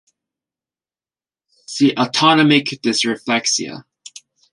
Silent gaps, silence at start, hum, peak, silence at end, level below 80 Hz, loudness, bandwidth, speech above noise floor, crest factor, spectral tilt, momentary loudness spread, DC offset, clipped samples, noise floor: none; 1.7 s; none; 0 dBFS; 0.7 s; -66 dBFS; -16 LUFS; 11.5 kHz; over 74 dB; 18 dB; -3.5 dB/octave; 15 LU; under 0.1%; under 0.1%; under -90 dBFS